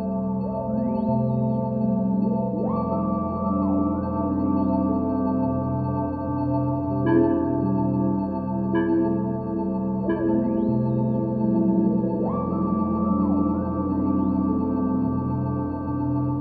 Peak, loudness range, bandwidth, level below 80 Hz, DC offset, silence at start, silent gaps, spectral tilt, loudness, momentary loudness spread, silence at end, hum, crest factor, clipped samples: -8 dBFS; 1 LU; 4.6 kHz; -46 dBFS; under 0.1%; 0 s; none; -13 dB/octave; -24 LUFS; 5 LU; 0 s; none; 14 dB; under 0.1%